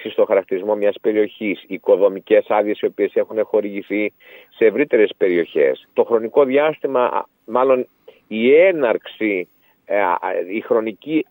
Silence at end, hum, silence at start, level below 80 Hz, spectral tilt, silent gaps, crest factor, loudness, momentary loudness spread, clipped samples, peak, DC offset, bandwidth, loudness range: 0.05 s; none; 0 s; -76 dBFS; -8 dB/octave; none; 16 dB; -18 LUFS; 8 LU; under 0.1%; -2 dBFS; under 0.1%; 16.5 kHz; 2 LU